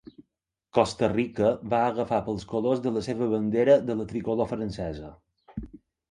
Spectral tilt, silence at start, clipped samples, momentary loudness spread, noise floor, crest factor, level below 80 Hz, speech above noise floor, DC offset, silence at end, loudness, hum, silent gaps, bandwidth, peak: -7 dB/octave; 0.2 s; under 0.1%; 19 LU; -81 dBFS; 22 dB; -52 dBFS; 56 dB; under 0.1%; 0.35 s; -26 LUFS; none; none; 11 kHz; -4 dBFS